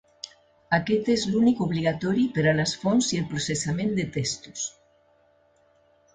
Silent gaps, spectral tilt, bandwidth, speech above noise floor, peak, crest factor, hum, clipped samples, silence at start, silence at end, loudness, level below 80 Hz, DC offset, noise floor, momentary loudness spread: none; -5 dB/octave; 9.4 kHz; 38 dB; -6 dBFS; 20 dB; none; under 0.1%; 0.25 s; 1.45 s; -25 LUFS; -56 dBFS; under 0.1%; -62 dBFS; 11 LU